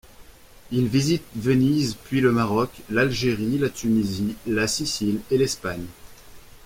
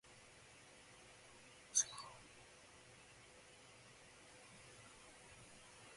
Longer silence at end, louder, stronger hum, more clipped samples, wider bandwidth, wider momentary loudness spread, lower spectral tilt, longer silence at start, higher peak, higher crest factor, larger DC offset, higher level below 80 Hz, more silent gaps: about the same, 0.1 s vs 0 s; first, -23 LUFS vs -41 LUFS; neither; neither; first, 16.5 kHz vs 11.5 kHz; second, 7 LU vs 23 LU; first, -5.5 dB/octave vs 0 dB/octave; first, 0.2 s vs 0.05 s; first, -6 dBFS vs -24 dBFS; second, 18 dB vs 30 dB; neither; first, -48 dBFS vs -78 dBFS; neither